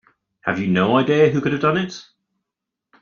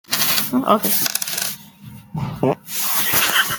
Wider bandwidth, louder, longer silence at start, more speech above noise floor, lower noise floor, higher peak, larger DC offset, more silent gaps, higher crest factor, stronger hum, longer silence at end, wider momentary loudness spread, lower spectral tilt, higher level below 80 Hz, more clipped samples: second, 7 kHz vs 19.5 kHz; about the same, -19 LUFS vs -17 LUFS; first, 0.45 s vs 0.1 s; first, 66 dB vs 21 dB; first, -84 dBFS vs -40 dBFS; about the same, -2 dBFS vs 0 dBFS; neither; neither; about the same, 18 dB vs 20 dB; neither; first, 1 s vs 0 s; about the same, 12 LU vs 14 LU; first, -7 dB/octave vs -2.5 dB/octave; about the same, -58 dBFS vs -54 dBFS; neither